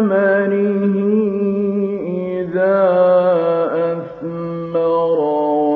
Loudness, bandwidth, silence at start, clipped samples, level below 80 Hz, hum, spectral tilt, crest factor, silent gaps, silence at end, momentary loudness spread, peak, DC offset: -16 LUFS; 4.6 kHz; 0 s; under 0.1%; -60 dBFS; none; -10.5 dB/octave; 12 dB; none; 0 s; 9 LU; -4 dBFS; under 0.1%